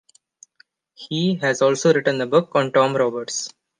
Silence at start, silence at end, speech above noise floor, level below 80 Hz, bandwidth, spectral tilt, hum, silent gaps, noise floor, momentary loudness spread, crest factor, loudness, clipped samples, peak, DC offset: 1 s; 0.3 s; 39 dB; -72 dBFS; 10 kHz; -4.5 dB/octave; none; none; -58 dBFS; 9 LU; 18 dB; -20 LUFS; under 0.1%; -2 dBFS; under 0.1%